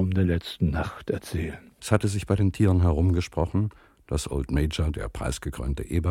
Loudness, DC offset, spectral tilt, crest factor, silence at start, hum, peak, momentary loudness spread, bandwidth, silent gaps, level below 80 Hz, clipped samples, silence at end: -27 LUFS; under 0.1%; -6.5 dB/octave; 22 dB; 0 s; none; -4 dBFS; 10 LU; 14.5 kHz; none; -34 dBFS; under 0.1%; 0 s